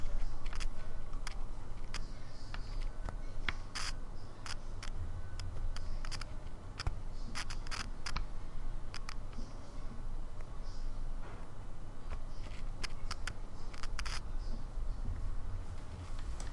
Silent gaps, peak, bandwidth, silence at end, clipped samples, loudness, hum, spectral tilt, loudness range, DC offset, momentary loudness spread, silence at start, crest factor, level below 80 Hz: none; -16 dBFS; 11.5 kHz; 0 s; under 0.1%; -46 LUFS; none; -4 dB/octave; 4 LU; under 0.1%; 7 LU; 0 s; 20 dB; -40 dBFS